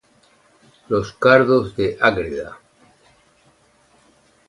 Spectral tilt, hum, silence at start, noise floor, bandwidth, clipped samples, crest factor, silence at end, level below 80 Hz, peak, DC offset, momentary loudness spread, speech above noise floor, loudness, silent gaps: -6.5 dB/octave; none; 0.9 s; -57 dBFS; 11 kHz; under 0.1%; 22 dB; 1.95 s; -50 dBFS; 0 dBFS; under 0.1%; 15 LU; 39 dB; -18 LUFS; none